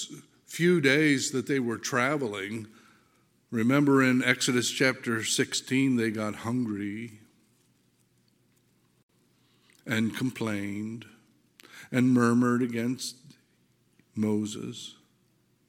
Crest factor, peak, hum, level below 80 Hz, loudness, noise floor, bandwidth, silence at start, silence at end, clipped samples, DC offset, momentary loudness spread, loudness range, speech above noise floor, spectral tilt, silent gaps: 22 dB; -6 dBFS; none; -76 dBFS; -27 LUFS; -68 dBFS; 16.5 kHz; 0 s; 0.75 s; under 0.1%; under 0.1%; 18 LU; 11 LU; 41 dB; -4.5 dB/octave; 9.03-9.09 s